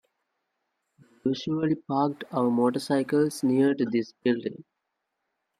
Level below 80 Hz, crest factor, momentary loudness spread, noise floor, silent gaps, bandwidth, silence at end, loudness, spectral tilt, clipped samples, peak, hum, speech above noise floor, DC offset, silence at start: -74 dBFS; 16 dB; 7 LU; -81 dBFS; none; 14 kHz; 1 s; -26 LUFS; -6.5 dB/octave; under 0.1%; -10 dBFS; none; 56 dB; under 0.1%; 1.25 s